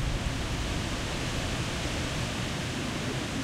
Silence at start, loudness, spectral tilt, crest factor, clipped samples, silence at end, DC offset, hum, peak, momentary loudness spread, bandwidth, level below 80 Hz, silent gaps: 0 s; -32 LUFS; -4 dB/octave; 14 dB; under 0.1%; 0 s; under 0.1%; none; -18 dBFS; 1 LU; 16 kHz; -38 dBFS; none